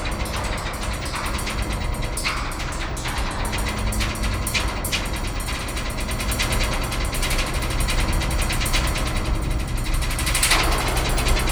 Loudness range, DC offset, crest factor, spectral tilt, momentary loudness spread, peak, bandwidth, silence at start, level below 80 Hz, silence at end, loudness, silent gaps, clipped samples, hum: 4 LU; under 0.1%; 18 dB; -3.5 dB/octave; 6 LU; -4 dBFS; over 20 kHz; 0 s; -26 dBFS; 0 s; -24 LUFS; none; under 0.1%; none